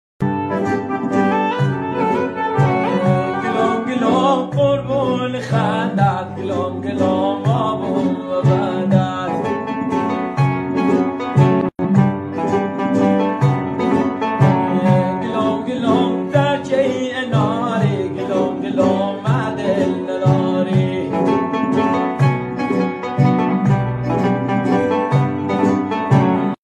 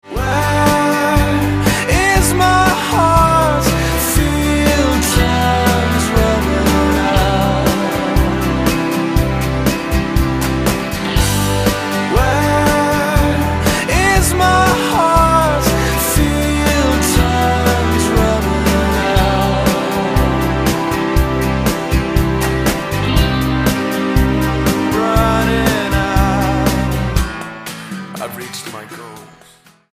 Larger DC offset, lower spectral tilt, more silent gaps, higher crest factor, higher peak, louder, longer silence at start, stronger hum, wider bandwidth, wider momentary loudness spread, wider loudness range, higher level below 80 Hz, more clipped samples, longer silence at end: neither; first, -8 dB/octave vs -5 dB/octave; neither; about the same, 16 dB vs 14 dB; about the same, -2 dBFS vs 0 dBFS; second, -18 LUFS vs -14 LUFS; first, 0.2 s vs 0.05 s; neither; second, 9.4 kHz vs 15.5 kHz; about the same, 5 LU vs 5 LU; about the same, 2 LU vs 3 LU; second, -52 dBFS vs -22 dBFS; neither; second, 0.1 s vs 0.65 s